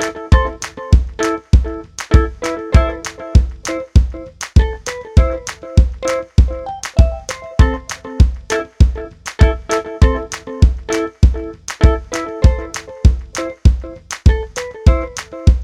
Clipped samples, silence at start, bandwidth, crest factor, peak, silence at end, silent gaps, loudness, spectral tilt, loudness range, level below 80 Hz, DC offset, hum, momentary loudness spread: 0.4%; 0 s; 11 kHz; 14 dB; 0 dBFS; 0 s; none; -16 LUFS; -6 dB/octave; 1 LU; -16 dBFS; under 0.1%; none; 11 LU